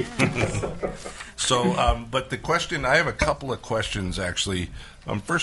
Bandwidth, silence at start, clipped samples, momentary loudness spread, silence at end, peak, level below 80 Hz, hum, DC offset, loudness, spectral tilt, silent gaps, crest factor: 11.5 kHz; 0 s; under 0.1%; 12 LU; 0 s; -4 dBFS; -38 dBFS; none; under 0.1%; -25 LUFS; -4 dB/octave; none; 20 dB